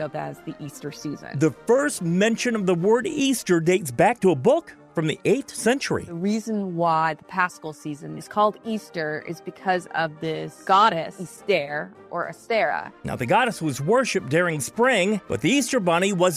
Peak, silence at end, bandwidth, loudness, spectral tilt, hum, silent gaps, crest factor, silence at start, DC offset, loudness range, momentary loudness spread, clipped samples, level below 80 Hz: -6 dBFS; 0 s; 16 kHz; -23 LUFS; -5 dB/octave; none; none; 18 dB; 0 s; under 0.1%; 4 LU; 13 LU; under 0.1%; -60 dBFS